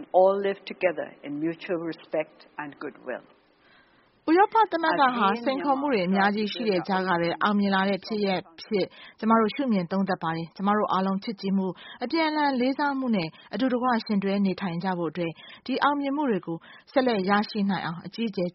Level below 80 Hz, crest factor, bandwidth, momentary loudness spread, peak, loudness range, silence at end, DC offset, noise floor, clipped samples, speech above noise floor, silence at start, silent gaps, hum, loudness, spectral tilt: -70 dBFS; 18 dB; 5.8 kHz; 12 LU; -8 dBFS; 4 LU; 0.05 s; under 0.1%; -60 dBFS; under 0.1%; 35 dB; 0 s; none; none; -26 LUFS; -4.5 dB/octave